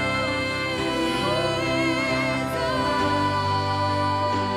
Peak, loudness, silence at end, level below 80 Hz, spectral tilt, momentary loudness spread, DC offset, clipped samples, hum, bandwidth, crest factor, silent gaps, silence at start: -12 dBFS; -23 LUFS; 0 s; -46 dBFS; -5 dB/octave; 2 LU; under 0.1%; under 0.1%; none; 16 kHz; 12 dB; none; 0 s